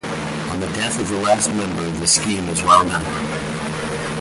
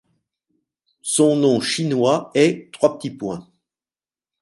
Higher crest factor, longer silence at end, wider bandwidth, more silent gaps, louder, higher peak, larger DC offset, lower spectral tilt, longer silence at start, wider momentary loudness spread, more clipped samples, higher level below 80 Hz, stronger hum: about the same, 20 dB vs 20 dB; second, 0 s vs 1 s; about the same, 11.5 kHz vs 11.5 kHz; neither; about the same, -19 LUFS vs -19 LUFS; about the same, 0 dBFS vs -2 dBFS; neither; about the same, -3.5 dB/octave vs -4.5 dB/octave; second, 0.05 s vs 1.05 s; second, 11 LU vs 14 LU; neither; first, -42 dBFS vs -64 dBFS; neither